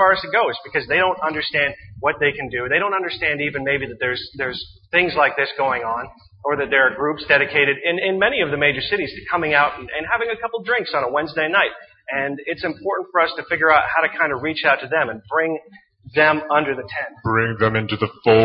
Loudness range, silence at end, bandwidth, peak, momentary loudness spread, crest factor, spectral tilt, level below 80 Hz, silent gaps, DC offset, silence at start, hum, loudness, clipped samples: 3 LU; 0 s; 5.6 kHz; 0 dBFS; 9 LU; 20 dB; -8 dB/octave; -52 dBFS; none; under 0.1%; 0 s; none; -19 LUFS; under 0.1%